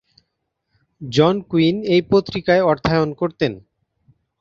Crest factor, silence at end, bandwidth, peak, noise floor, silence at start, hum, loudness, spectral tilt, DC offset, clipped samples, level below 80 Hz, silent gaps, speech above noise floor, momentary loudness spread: 18 dB; 0.8 s; 7.6 kHz; -2 dBFS; -75 dBFS; 1 s; none; -18 LUFS; -7 dB/octave; under 0.1%; under 0.1%; -48 dBFS; none; 57 dB; 8 LU